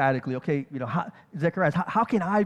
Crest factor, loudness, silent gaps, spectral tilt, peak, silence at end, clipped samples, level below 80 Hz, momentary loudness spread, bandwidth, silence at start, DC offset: 16 dB; -27 LUFS; none; -8.5 dB/octave; -8 dBFS; 0 s; under 0.1%; -64 dBFS; 6 LU; 10 kHz; 0 s; under 0.1%